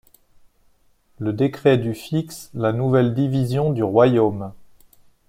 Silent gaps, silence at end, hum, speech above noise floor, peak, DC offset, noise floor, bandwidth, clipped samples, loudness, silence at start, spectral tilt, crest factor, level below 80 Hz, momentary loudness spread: none; 0.65 s; none; 39 dB; -2 dBFS; under 0.1%; -58 dBFS; 15.5 kHz; under 0.1%; -20 LUFS; 1.2 s; -8 dB/octave; 18 dB; -56 dBFS; 12 LU